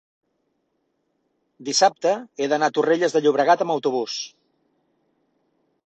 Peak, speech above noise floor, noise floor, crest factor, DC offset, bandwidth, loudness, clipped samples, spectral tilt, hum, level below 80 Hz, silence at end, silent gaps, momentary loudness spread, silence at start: -4 dBFS; 52 dB; -72 dBFS; 20 dB; under 0.1%; 8.8 kHz; -21 LUFS; under 0.1%; -3 dB/octave; none; -74 dBFS; 1.6 s; none; 11 LU; 1.6 s